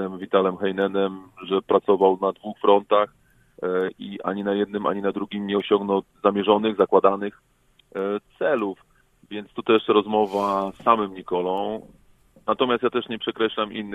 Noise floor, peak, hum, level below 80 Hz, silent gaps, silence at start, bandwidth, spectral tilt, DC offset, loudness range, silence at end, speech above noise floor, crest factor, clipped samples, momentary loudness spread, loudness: -56 dBFS; -2 dBFS; none; -64 dBFS; none; 0 s; 7.8 kHz; -7 dB/octave; under 0.1%; 3 LU; 0 s; 33 dB; 22 dB; under 0.1%; 12 LU; -23 LUFS